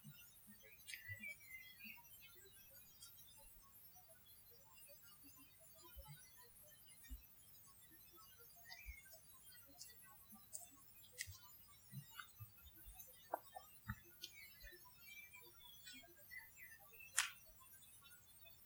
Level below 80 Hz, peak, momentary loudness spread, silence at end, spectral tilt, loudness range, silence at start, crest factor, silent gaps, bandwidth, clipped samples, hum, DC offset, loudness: -72 dBFS; -16 dBFS; 10 LU; 0 s; -1.5 dB/octave; 10 LU; 0 s; 42 dB; none; over 20 kHz; under 0.1%; none; under 0.1%; -56 LUFS